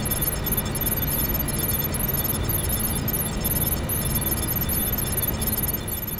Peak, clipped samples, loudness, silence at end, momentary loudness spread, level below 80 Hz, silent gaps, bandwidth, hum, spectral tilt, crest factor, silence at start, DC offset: -10 dBFS; under 0.1%; -23 LUFS; 0 s; 2 LU; -34 dBFS; none; 18 kHz; none; -4 dB/octave; 14 dB; 0 s; under 0.1%